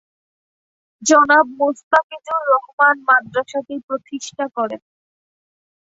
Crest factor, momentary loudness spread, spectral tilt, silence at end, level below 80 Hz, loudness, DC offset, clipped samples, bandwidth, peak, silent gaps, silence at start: 18 dB; 14 LU; -2 dB/octave; 1.2 s; -68 dBFS; -17 LUFS; under 0.1%; under 0.1%; 8 kHz; -2 dBFS; 1.83-1.91 s, 2.04-2.10 s, 2.73-2.78 s, 3.83-3.88 s; 1 s